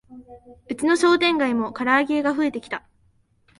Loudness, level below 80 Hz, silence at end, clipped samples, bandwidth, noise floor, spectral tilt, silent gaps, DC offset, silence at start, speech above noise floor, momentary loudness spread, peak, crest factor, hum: -21 LUFS; -60 dBFS; 0.8 s; under 0.1%; 11.5 kHz; -62 dBFS; -3.5 dB/octave; none; under 0.1%; 0.1 s; 40 dB; 15 LU; -6 dBFS; 18 dB; none